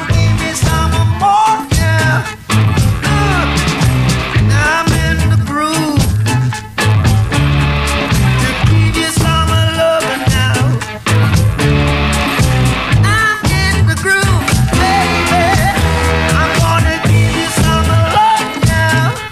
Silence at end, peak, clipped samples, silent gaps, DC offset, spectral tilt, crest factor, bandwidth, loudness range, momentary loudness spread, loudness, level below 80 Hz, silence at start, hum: 0 s; 0 dBFS; under 0.1%; none; under 0.1%; -5 dB/octave; 12 dB; 15.5 kHz; 1 LU; 3 LU; -12 LUFS; -22 dBFS; 0 s; none